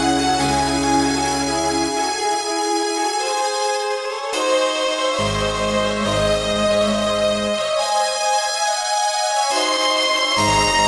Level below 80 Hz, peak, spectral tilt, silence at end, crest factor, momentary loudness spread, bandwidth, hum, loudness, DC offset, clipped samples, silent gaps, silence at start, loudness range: -40 dBFS; -6 dBFS; -2.5 dB/octave; 0 s; 14 dB; 4 LU; 12.5 kHz; none; -19 LUFS; under 0.1%; under 0.1%; none; 0 s; 2 LU